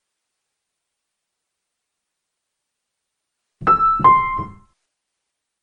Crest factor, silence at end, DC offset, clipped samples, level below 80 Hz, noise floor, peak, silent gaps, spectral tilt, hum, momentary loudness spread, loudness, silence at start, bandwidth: 20 dB; 1.1 s; under 0.1%; under 0.1%; -48 dBFS; -80 dBFS; -2 dBFS; none; -7.5 dB/octave; none; 14 LU; -15 LUFS; 3.6 s; 5.6 kHz